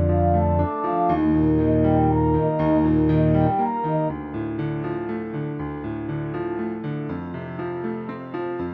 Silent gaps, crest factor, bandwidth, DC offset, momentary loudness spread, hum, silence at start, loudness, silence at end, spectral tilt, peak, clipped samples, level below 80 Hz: none; 14 dB; 4.6 kHz; under 0.1%; 11 LU; none; 0 s; -23 LUFS; 0 s; -12 dB/octave; -8 dBFS; under 0.1%; -38 dBFS